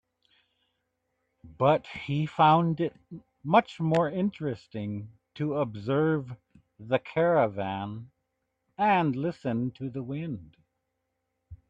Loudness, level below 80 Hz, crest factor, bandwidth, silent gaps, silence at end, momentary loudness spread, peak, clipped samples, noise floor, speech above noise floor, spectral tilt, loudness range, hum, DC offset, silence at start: -28 LUFS; -64 dBFS; 20 dB; 7.8 kHz; none; 0.15 s; 15 LU; -8 dBFS; under 0.1%; -81 dBFS; 53 dB; -8.5 dB/octave; 5 LU; none; under 0.1%; 1.45 s